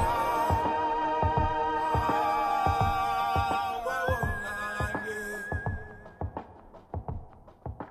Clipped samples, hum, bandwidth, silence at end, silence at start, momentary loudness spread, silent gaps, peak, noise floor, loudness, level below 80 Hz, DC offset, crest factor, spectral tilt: under 0.1%; none; 15.5 kHz; 0 s; 0 s; 15 LU; none; -12 dBFS; -51 dBFS; -29 LUFS; -42 dBFS; under 0.1%; 18 dB; -6 dB/octave